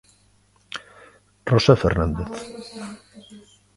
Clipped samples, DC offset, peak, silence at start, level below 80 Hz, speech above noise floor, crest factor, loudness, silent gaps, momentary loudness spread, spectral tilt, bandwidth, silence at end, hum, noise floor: under 0.1%; under 0.1%; 0 dBFS; 0.7 s; -38 dBFS; 38 dB; 24 dB; -20 LUFS; none; 20 LU; -6.5 dB/octave; 11.5 kHz; 0.4 s; 50 Hz at -55 dBFS; -59 dBFS